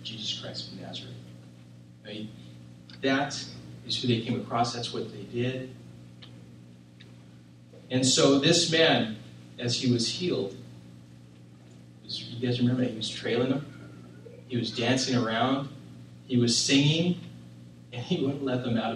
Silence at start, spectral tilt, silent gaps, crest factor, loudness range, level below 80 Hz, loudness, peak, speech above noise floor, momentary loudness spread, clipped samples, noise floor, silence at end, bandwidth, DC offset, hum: 0 s; -4 dB/octave; none; 22 dB; 10 LU; -64 dBFS; -27 LUFS; -6 dBFS; 24 dB; 26 LU; under 0.1%; -51 dBFS; 0 s; 12.5 kHz; under 0.1%; 60 Hz at -45 dBFS